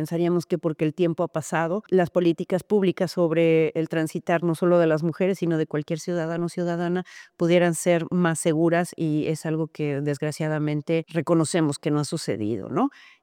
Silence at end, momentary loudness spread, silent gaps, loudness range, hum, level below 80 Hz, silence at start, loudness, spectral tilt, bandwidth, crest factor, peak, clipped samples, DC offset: 0.35 s; 7 LU; none; 3 LU; none; -70 dBFS; 0 s; -24 LUFS; -6.5 dB/octave; 15.5 kHz; 14 dB; -8 dBFS; under 0.1%; under 0.1%